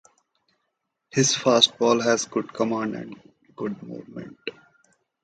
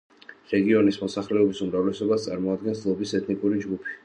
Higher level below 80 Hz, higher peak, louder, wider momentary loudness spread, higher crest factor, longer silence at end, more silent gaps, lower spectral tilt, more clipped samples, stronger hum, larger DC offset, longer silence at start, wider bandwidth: second, -68 dBFS vs -60 dBFS; first, -2 dBFS vs -8 dBFS; first, -22 LUFS vs -25 LUFS; first, 20 LU vs 7 LU; first, 24 dB vs 16 dB; first, 0.75 s vs 0.05 s; neither; second, -3 dB/octave vs -6.5 dB/octave; neither; neither; neither; first, 1.15 s vs 0.3 s; about the same, 9.4 kHz vs 9.6 kHz